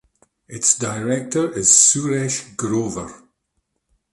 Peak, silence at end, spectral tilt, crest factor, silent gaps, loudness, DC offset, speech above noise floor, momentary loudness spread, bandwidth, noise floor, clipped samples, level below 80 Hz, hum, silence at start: 0 dBFS; 0.95 s; -3 dB/octave; 22 dB; none; -17 LUFS; under 0.1%; 53 dB; 17 LU; 12 kHz; -73 dBFS; under 0.1%; -54 dBFS; none; 0.5 s